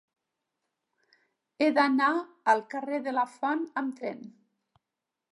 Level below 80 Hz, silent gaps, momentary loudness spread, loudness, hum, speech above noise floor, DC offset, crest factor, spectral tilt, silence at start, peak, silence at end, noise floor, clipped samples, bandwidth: -86 dBFS; none; 12 LU; -28 LUFS; none; 59 dB; under 0.1%; 22 dB; -4.5 dB/octave; 1.6 s; -8 dBFS; 1.05 s; -87 dBFS; under 0.1%; 11.5 kHz